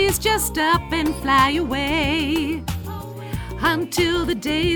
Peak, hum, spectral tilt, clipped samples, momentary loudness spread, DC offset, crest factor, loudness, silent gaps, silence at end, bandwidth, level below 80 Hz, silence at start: -4 dBFS; none; -4 dB/octave; under 0.1%; 13 LU; under 0.1%; 18 dB; -20 LUFS; none; 0 s; over 20 kHz; -34 dBFS; 0 s